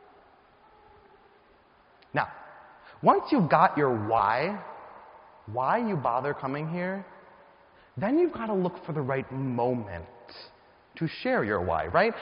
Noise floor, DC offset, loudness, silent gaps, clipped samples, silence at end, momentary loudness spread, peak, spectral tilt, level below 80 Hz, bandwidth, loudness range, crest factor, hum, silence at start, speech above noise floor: -60 dBFS; under 0.1%; -27 LUFS; none; under 0.1%; 0 s; 21 LU; -6 dBFS; -5.5 dB/octave; -60 dBFS; 5.4 kHz; 6 LU; 22 dB; none; 2.15 s; 33 dB